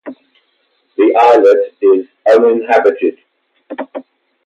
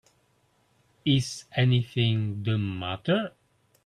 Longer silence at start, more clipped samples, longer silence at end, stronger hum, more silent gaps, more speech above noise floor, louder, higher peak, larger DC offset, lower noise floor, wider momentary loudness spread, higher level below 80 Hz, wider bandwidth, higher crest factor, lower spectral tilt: second, 0.05 s vs 1.05 s; neither; about the same, 0.45 s vs 0.55 s; neither; neither; first, 51 dB vs 42 dB; first, -11 LUFS vs -27 LUFS; first, 0 dBFS vs -10 dBFS; neither; second, -60 dBFS vs -67 dBFS; first, 20 LU vs 8 LU; second, -68 dBFS vs -60 dBFS; second, 7.8 kHz vs 11.5 kHz; second, 12 dB vs 18 dB; about the same, -5 dB/octave vs -6 dB/octave